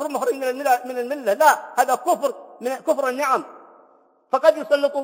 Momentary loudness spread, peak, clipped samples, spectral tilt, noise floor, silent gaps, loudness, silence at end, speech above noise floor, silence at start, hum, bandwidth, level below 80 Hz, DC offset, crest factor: 10 LU; -2 dBFS; under 0.1%; -2 dB/octave; -56 dBFS; none; -21 LUFS; 0 s; 36 dB; 0 s; none; 16.5 kHz; -82 dBFS; under 0.1%; 20 dB